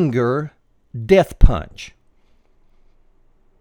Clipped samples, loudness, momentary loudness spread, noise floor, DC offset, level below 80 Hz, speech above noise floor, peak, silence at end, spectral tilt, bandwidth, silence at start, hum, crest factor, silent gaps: 0.1%; -18 LUFS; 21 LU; -55 dBFS; under 0.1%; -22 dBFS; 40 dB; 0 dBFS; 1.75 s; -7.5 dB/octave; 10 kHz; 0 s; none; 18 dB; none